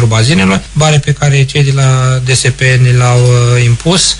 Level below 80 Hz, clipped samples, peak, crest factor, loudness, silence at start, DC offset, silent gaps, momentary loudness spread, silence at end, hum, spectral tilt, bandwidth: -30 dBFS; under 0.1%; 0 dBFS; 8 dB; -8 LUFS; 0 s; under 0.1%; none; 3 LU; 0 s; none; -4.5 dB/octave; 11 kHz